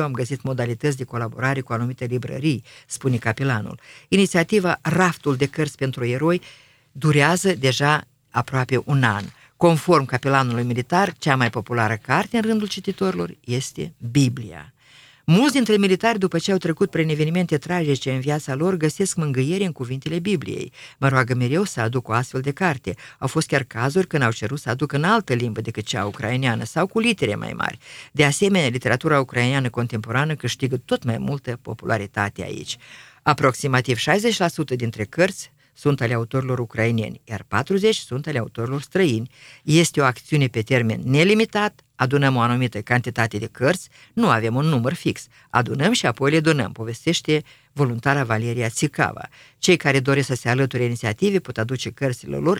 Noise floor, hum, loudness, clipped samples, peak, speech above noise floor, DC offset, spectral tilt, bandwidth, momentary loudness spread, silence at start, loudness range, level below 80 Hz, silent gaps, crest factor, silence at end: -51 dBFS; none; -21 LUFS; under 0.1%; 0 dBFS; 30 dB; under 0.1%; -5.5 dB/octave; 16 kHz; 9 LU; 0 s; 3 LU; -56 dBFS; none; 22 dB; 0 s